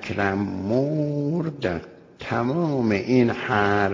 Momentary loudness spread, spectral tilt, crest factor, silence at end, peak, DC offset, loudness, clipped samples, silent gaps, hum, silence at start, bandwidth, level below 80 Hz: 8 LU; -7.5 dB/octave; 18 dB; 0 s; -6 dBFS; under 0.1%; -23 LUFS; under 0.1%; none; none; 0 s; 7.6 kHz; -50 dBFS